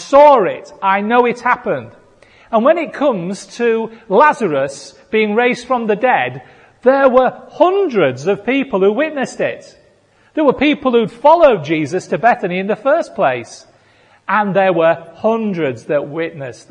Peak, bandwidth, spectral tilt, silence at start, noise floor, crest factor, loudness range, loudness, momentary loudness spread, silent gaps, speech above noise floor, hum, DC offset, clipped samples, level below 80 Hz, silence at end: 0 dBFS; 10 kHz; -6 dB/octave; 0 s; -52 dBFS; 14 dB; 3 LU; -15 LUFS; 11 LU; none; 38 dB; none; under 0.1%; under 0.1%; -54 dBFS; 0.15 s